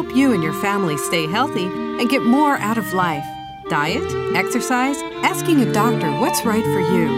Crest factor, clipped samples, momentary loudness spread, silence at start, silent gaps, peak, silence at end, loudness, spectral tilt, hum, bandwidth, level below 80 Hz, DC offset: 16 dB; under 0.1%; 6 LU; 0 s; none; -2 dBFS; 0 s; -19 LUFS; -5 dB/octave; none; 16 kHz; -52 dBFS; under 0.1%